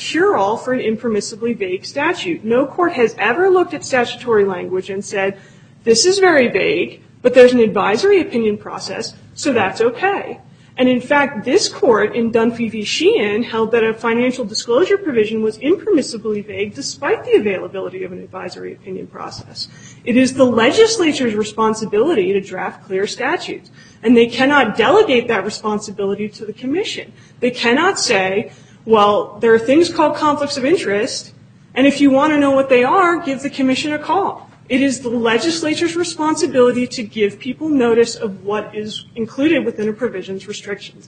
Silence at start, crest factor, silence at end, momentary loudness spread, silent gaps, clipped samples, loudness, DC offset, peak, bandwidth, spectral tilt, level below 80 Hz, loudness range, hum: 0 s; 16 dB; 0.15 s; 14 LU; none; under 0.1%; -16 LUFS; under 0.1%; 0 dBFS; 9.4 kHz; -4 dB/octave; -56 dBFS; 4 LU; none